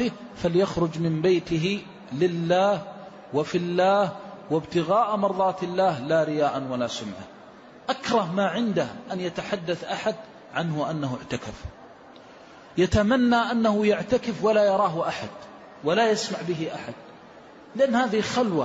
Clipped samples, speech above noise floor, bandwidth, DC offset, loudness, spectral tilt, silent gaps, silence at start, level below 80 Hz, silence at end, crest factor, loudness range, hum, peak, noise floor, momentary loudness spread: under 0.1%; 23 dB; 8 kHz; under 0.1%; -25 LUFS; -6 dB/octave; none; 0 s; -52 dBFS; 0 s; 14 dB; 6 LU; none; -10 dBFS; -47 dBFS; 15 LU